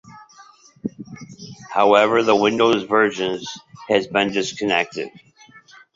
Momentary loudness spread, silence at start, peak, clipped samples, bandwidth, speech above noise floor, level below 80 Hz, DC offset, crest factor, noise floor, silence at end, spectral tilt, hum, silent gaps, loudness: 22 LU; 0.05 s; 0 dBFS; under 0.1%; 7.8 kHz; 31 dB; -62 dBFS; under 0.1%; 20 dB; -49 dBFS; 0.85 s; -4 dB/octave; none; none; -18 LUFS